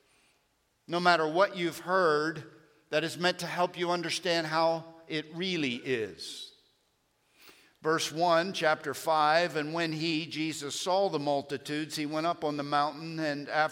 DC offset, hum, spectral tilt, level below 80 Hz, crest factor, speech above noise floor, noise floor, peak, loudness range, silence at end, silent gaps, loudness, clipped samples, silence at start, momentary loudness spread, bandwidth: under 0.1%; none; -4 dB/octave; -78 dBFS; 22 dB; 43 dB; -73 dBFS; -8 dBFS; 4 LU; 0 s; none; -30 LUFS; under 0.1%; 0.9 s; 10 LU; 16.5 kHz